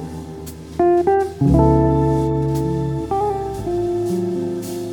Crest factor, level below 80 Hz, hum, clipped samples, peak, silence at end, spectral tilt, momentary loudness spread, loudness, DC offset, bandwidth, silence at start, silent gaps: 16 dB; -30 dBFS; none; under 0.1%; -2 dBFS; 0 s; -8.5 dB/octave; 13 LU; -19 LUFS; under 0.1%; 18.5 kHz; 0 s; none